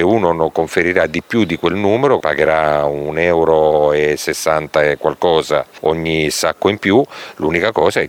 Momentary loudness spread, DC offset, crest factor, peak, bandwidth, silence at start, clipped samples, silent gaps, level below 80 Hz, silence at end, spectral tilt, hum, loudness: 5 LU; under 0.1%; 14 dB; 0 dBFS; 18 kHz; 0 s; under 0.1%; none; -44 dBFS; 0 s; -5 dB/octave; none; -15 LUFS